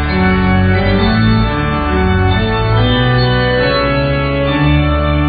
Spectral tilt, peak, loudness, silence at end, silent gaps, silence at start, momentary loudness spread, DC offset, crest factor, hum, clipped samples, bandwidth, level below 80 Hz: -5 dB/octave; 0 dBFS; -13 LUFS; 0 s; none; 0 s; 3 LU; under 0.1%; 12 dB; none; under 0.1%; 5 kHz; -20 dBFS